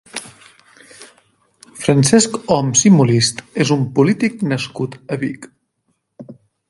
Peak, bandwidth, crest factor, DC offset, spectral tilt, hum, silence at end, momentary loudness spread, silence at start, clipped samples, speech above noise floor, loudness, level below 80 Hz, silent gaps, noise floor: 0 dBFS; 11.5 kHz; 18 dB; under 0.1%; -4.5 dB/octave; none; 0.35 s; 14 LU; 0.15 s; under 0.1%; 53 dB; -15 LUFS; -56 dBFS; none; -68 dBFS